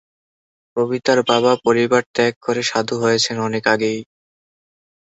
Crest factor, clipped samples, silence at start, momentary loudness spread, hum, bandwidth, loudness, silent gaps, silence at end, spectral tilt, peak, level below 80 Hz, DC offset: 18 dB; under 0.1%; 0.75 s; 7 LU; none; 8.2 kHz; -18 LUFS; 2.06-2.14 s, 2.36-2.41 s; 1 s; -4 dB/octave; -2 dBFS; -62 dBFS; under 0.1%